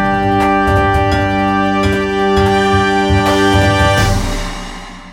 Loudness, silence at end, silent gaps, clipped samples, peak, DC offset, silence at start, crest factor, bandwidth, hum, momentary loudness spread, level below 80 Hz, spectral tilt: -13 LUFS; 0 s; none; under 0.1%; -2 dBFS; under 0.1%; 0 s; 12 dB; 16.5 kHz; none; 10 LU; -26 dBFS; -5.5 dB/octave